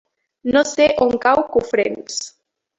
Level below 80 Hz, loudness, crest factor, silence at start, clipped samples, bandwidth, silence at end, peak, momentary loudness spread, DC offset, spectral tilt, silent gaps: -52 dBFS; -18 LUFS; 16 dB; 0.45 s; under 0.1%; 8.2 kHz; 0.5 s; -2 dBFS; 12 LU; under 0.1%; -3 dB/octave; none